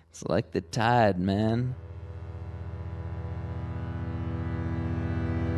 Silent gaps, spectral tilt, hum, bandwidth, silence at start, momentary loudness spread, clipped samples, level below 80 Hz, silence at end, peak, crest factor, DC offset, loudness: none; -7 dB/octave; none; 12 kHz; 0.15 s; 16 LU; under 0.1%; -40 dBFS; 0 s; -10 dBFS; 20 dB; under 0.1%; -30 LUFS